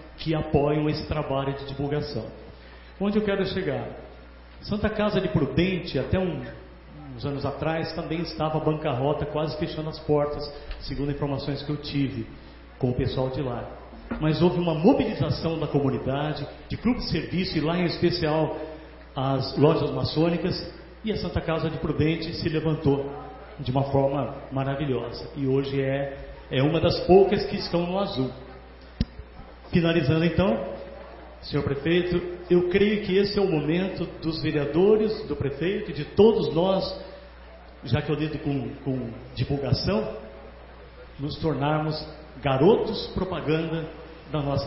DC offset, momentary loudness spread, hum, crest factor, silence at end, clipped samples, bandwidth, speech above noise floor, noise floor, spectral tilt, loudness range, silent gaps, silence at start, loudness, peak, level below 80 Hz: under 0.1%; 18 LU; none; 22 dB; 0 s; under 0.1%; 5.8 kHz; 21 dB; -45 dBFS; -10.5 dB/octave; 5 LU; none; 0 s; -26 LUFS; -4 dBFS; -44 dBFS